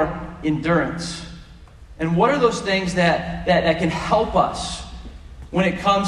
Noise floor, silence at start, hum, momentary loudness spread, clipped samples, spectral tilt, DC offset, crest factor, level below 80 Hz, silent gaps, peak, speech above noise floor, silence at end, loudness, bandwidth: -43 dBFS; 0 s; none; 15 LU; under 0.1%; -5.5 dB/octave; under 0.1%; 18 dB; -40 dBFS; none; -2 dBFS; 23 dB; 0 s; -20 LUFS; 11.5 kHz